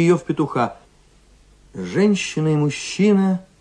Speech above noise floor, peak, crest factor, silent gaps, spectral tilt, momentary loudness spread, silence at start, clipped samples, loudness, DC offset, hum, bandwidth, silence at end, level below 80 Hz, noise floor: 34 dB; -4 dBFS; 16 dB; none; -6 dB/octave; 9 LU; 0 s; under 0.1%; -19 LUFS; under 0.1%; none; 10 kHz; 0.2 s; -54 dBFS; -52 dBFS